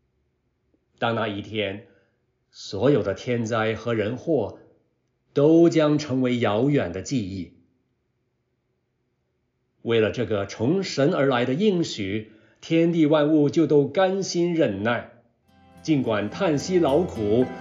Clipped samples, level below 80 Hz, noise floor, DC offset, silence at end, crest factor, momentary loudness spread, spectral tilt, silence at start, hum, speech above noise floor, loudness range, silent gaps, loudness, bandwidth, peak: under 0.1%; -62 dBFS; -73 dBFS; under 0.1%; 0 s; 18 dB; 10 LU; -6.5 dB/octave; 1 s; none; 51 dB; 7 LU; none; -23 LUFS; 7.6 kHz; -6 dBFS